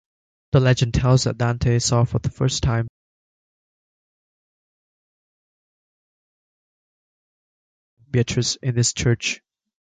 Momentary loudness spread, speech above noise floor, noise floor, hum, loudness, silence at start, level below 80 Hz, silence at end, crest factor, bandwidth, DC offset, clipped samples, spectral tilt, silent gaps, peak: 7 LU; over 71 dB; under -90 dBFS; none; -20 LUFS; 0.55 s; -40 dBFS; 0.45 s; 22 dB; 9.4 kHz; under 0.1%; under 0.1%; -5 dB/octave; 2.89-7.97 s; -2 dBFS